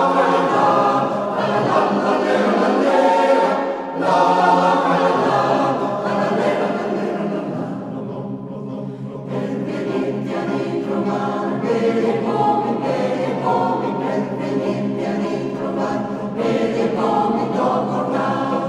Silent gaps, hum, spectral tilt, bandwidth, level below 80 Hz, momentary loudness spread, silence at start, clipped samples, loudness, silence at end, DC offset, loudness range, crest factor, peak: none; none; -6.5 dB/octave; 11.5 kHz; -62 dBFS; 10 LU; 0 s; under 0.1%; -19 LUFS; 0 s; under 0.1%; 8 LU; 16 dB; -2 dBFS